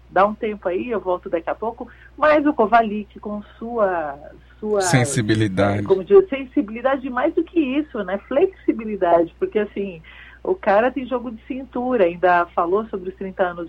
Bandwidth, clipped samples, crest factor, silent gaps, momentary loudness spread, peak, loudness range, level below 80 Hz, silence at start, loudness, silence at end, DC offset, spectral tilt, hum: 12.5 kHz; under 0.1%; 18 dB; none; 14 LU; -2 dBFS; 3 LU; -48 dBFS; 0.1 s; -20 LUFS; 0 s; under 0.1%; -6 dB/octave; none